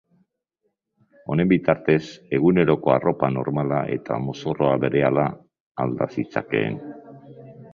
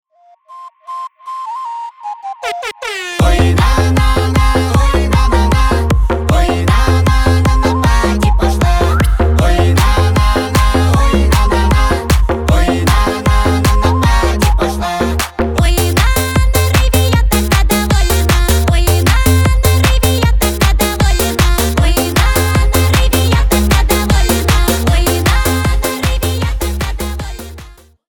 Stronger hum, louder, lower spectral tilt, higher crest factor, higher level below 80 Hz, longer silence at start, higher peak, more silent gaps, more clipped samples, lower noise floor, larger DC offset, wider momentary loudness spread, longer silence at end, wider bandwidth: neither; second, -22 LUFS vs -12 LUFS; first, -8.5 dB/octave vs -5 dB/octave; first, 20 dB vs 12 dB; second, -54 dBFS vs -14 dBFS; first, 1.3 s vs 0.5 s; about the same, -2 dBFS vs 0 dBFS; first, 5.60-5.75 s vs none; neither; first, -75 dBFS vs -43 dBFS; neither; about the same, 9 LU vs 9 LU; second, 0.05 s vs 0.35 s; second, 7.2 kHz vs 19.5 kHz